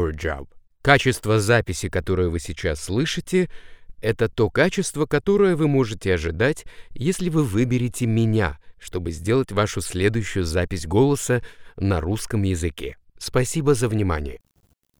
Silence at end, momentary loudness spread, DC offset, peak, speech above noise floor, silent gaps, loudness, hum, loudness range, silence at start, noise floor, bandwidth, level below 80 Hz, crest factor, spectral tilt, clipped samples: 0.6 s; 10 LU; under 0.1%; 0 dBFS; 43 dB; none; -22 LUFS; none; 2 LU; 0 s; -64 dBFS; 19.5 kHz; -38 dBFS; 22 dB; -5.5 dB/octave; under 0.1%